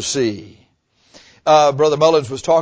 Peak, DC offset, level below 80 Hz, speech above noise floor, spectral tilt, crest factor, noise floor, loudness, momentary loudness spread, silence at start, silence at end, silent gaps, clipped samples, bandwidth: -2 dBFS; under 0.1%; -54 dBFS; 44 dB; -4 dB/octave; 16 dB; -59 dBFS; -15 LUFS; 10 LU; 0 s; 0 s; none; under 0.1%; 8 kHz